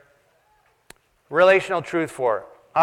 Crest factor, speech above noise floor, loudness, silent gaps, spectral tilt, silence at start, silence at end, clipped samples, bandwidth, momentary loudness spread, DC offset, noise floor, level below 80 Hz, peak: 20 dB; 43 dB; -21 LUFS; none; -5 dB/octave; 1.3 s; 0 s; under 0.1%; 12.5 kHz; 10 LU; under 0.1%; -62 dBFS; -66 dBFS; -2 dBFS